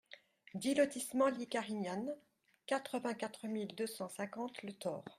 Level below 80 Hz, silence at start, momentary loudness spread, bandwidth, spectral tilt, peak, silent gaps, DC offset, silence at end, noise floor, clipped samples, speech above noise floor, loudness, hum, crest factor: -84 dBFS; 0.1 s; 13 LU; 15 kHz; -4.5 dB/octave; -20 dBFS; none; under 0.1%; 0.05 s; -61 dBFS; under 0.1%; 22 dB; -39 LUFS; none; 20 dB